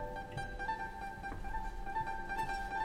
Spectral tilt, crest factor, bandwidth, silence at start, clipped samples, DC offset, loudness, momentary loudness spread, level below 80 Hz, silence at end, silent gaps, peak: -5 dB/octave; 14 dB; 16 kHz; 0 s; under 0.1%; under 0.1%; -41 LUFS; 5 LU; -46 dBFS; 0 s; none; -26 dBFS